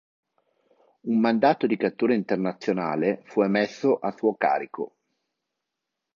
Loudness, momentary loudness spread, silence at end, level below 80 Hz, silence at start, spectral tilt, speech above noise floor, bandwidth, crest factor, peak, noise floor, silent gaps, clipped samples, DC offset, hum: -24 LUFS; 7 LU; 1.3 s; -74 dBFS; 1.05 s; -7 dB/octave; 60 dB; 7.2 kHz; 20 dB; -6 dBFS; -84 dBFS; none; under 0.1%; under 0.1%; none